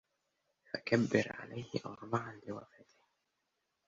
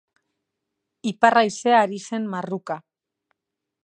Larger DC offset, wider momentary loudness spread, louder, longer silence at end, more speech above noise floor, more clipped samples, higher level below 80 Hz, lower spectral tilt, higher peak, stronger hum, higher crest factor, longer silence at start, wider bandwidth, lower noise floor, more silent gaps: neither; about the same, 16 LU vs 14 LU; second, -37 LUFS vs -21 LUFS; first, 1.25 s vs 1.05 s; second, 47 dB vs 63 dB; neither; about the same, -72 dBFS vs -76 dBFS; about the same, -5 dB/octave vs -4.5 dB/octave; second, -14 dBFS vs -2 dBFS; neither; about the same, 26 dB vs 22 dB; second, 0.75 s vs 1.05 s; second, 7.6 kHz vs 10 kHz; about the same, -84 dBFS vs -84 dBFS; neither